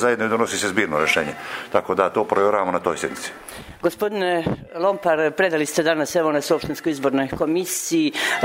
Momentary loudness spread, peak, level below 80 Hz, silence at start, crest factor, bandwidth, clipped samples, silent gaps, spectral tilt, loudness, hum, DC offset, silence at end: 7 LU; -2 dBFS; -54 dBFS; 0 s; 20 dB; 16 kHz; under 0.1%; none; -3.5 dB/octave; -21 LUFS; none; under 0.1%; 0 s